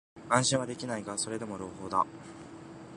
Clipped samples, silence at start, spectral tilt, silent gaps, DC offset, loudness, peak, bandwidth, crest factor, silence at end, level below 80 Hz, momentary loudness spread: under 0.1%; 0.15 s; -3.5 dB/octave; none; under 0.1%; -31 LUFS; -8 dBFS; 11.5 kHz; 26 dB; 0 s; -64 dBFS; 21 LU